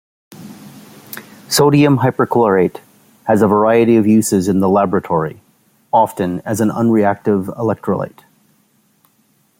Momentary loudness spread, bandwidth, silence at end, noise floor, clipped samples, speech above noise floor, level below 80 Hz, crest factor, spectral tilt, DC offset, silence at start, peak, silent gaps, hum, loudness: 15 LU; 16.5 kHz; 1.5 s; -58 dBFS; under 0.1%; 45 dB; -56 dBFS; 14 dB; -6 dB/octave; under 0.1%; 0.4 s; -2 dBFS; none; none; -14 LUFS